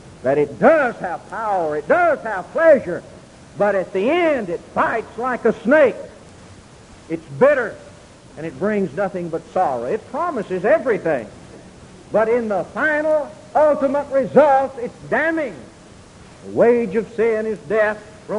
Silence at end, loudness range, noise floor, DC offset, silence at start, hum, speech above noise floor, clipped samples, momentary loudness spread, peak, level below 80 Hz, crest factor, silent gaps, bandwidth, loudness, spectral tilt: 0 s; 4 LU; -43 dBFS; under 0.1%; 0.05 s; none; 25 dB; under 0.1%; 14 LU; 0 dBFS; -52 dBFS; 18 dB; none; 11 kHz; -19 LUFS; -6.5 dB/octave